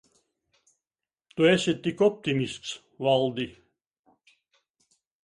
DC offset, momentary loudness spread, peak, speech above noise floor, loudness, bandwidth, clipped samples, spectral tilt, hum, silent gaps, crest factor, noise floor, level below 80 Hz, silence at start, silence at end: under 0.1%; 15 LU; -8 dBFS; over 65 dB; -26 LUFS; 11.5 kHz; under 0.1%; -5.5 dB/octave; none; none; 20 dB; under -90 dBFS; -66 dBFS; 1.35 s; 1.75 s